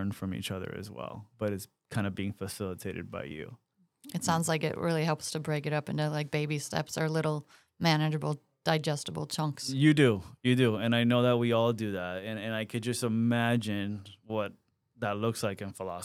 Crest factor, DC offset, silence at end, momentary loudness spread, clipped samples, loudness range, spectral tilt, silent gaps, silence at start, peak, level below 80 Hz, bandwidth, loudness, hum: 20 dB; under 0.1%; 0 s; 13 LU; under 0.1%; 9 LU; -5.5 dB/octave; none; 0 s; -10 dBFS; -70 dBFS; 15.5 kHz; -31 LUFS; none